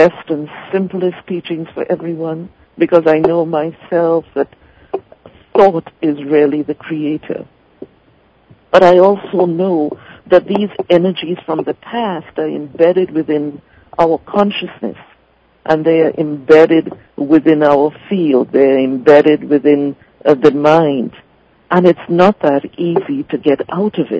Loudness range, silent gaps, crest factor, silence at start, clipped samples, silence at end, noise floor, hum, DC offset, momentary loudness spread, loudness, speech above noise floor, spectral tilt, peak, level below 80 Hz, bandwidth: 5 LU; none; 14 dB; 0 s; 0.8%; 0 s; -53 dBFS; none; under 0.1%; 13 LU; -13 LUFS; 40 dB; -8 dB/octave; 0 dBFS; -54 dBFS; 8 kHz